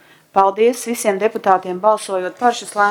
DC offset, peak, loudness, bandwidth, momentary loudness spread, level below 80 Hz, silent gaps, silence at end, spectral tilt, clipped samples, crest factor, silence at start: under 0.1%; 0 dBFS; -17 LUFS; 17 kHz; 5 LU; -68 dBFS; none; 0 s; -3.5 dB/octave; under 0.1%; 16 dB; 0.35 s